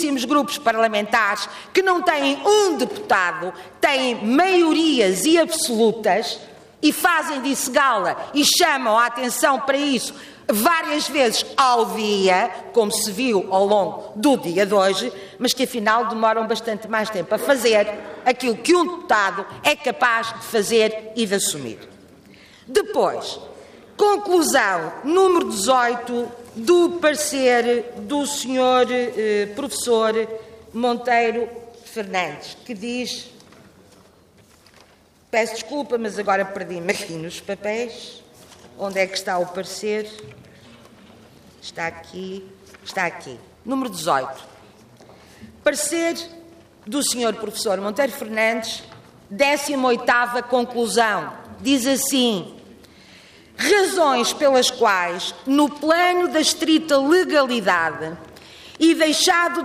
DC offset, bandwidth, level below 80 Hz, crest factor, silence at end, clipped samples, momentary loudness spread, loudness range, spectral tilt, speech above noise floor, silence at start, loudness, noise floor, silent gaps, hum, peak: under 0.1%; 15.5 kHz; -62 dBFS; 16 dB; 0 s; under 0.1%; 13 LU; 9 LU; -2.5 dB/octave; 34 dB; 0 s; -20 LUFS; -54 dBFS; none; none; -4 dBFS